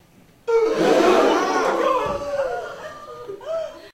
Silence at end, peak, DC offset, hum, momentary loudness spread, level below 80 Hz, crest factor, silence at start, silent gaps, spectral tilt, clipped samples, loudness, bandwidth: 0.05 s; -4 dBFS; under 0.1%; none; 19 LU; -52 dBFS; 16 dB; 0.45 s; none; -4 dB/octave; under 0.1%; -20 LUFS; 15.5 kHz